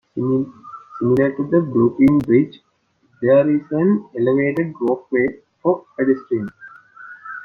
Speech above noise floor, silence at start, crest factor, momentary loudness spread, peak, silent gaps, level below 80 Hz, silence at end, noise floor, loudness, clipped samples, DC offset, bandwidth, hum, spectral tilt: 44 dB; 0.15 s; 16 dB; 14 LU; -4 dBFS; none; -56 dBFS; 0 s; -61 dBFS; -18 LUFS; under 0.1%; under 0.1%; 4.7 kHz; none; -10 dB/octave